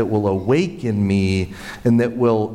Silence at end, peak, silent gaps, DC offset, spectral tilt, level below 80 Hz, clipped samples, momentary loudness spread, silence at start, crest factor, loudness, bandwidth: 0 s; -6 dBFS; none; under 0.1%; -7.5 dB/octave; -46 dBFS; under 0.1%; 6 LU; 0 s; 12 dB; -19 LUFS; 12.5 kHz